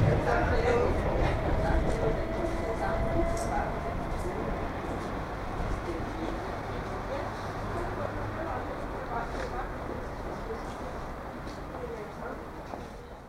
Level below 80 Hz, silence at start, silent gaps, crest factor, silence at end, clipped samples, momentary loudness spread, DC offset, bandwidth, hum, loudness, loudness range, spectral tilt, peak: -38 dBFS; 0 s; none; 18 dB; 0 s; under 0.1%; 12 LU; under 0.1%; 16 kHz; none; -33 LUFS; 8 LU; -7 dB/octave; -12 dBFS